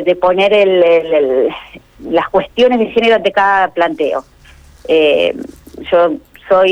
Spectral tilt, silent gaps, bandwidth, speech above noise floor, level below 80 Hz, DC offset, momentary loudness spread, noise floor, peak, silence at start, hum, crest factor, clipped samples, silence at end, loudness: -5.5 dB/octave; none; 9.2 kHz; 29 dB; -46 dBFS; under 0.1%; 16 LU; -41 dBFS; -2 dBFS; 0 s; none; 10 dB; under 0.1%; 0 s; -12 LUFS